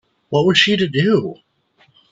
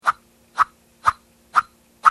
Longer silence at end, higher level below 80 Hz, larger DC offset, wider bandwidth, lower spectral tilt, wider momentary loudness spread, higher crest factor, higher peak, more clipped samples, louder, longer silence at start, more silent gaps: first, 0.8 s vs 0 s; about the same, -58 dBFS vs -58 dBFS; neither; second, 8 kHz vs 14 kHz; first, -5 dB/octave vs -1.5 dB/octave; second, 8 LU vs 13 LU; about the same, 18 dB vs 22 dB; about the same, 0 dBFS vs 0 dBFS; neither; first, -15 LUFS vs -22 LUFS; first, 0.3 s vs 0.05 s; neither